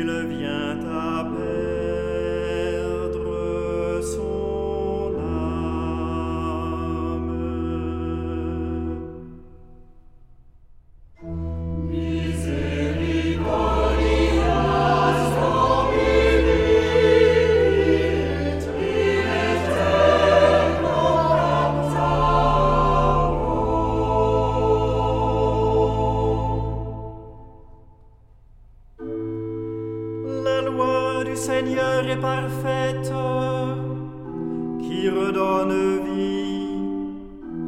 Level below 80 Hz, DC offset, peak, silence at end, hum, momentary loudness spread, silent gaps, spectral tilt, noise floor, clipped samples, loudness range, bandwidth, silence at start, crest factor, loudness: -32 dBFS; under 0.1%; -4 dBFS; 0 s; none; 12 LU; none; -6.5 dB/octave; -49 dBFS; under 0.1%; 12 LU; 14.5 kHz; 0 s; 18 dB; -22 LUFS